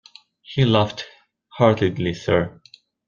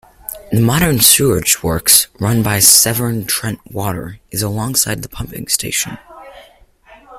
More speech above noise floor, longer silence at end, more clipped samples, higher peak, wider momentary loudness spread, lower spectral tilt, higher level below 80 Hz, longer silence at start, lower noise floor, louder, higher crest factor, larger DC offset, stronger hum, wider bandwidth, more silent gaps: second, 26 dB vs 31 dB; first, 0.6 s vs 0 s; second, under 0.1% vs 0.1%; about the same, -2 dBFS vs 0 dBFS; second, 13 LU vs 16 LU; first, -7 dB/octave vs -3 dB/octave; second, -54 dBFS vs -38 dBFS; first, 0.5 s vs 0.3 s; about the same, -45 dBFS vs -46 dBFS; second, -20 LUFS vs -13 LUFS; about the same, 20 dB vs 16 dB; neither; neither; second, 7.2 kHz vs over 20 kHz; neither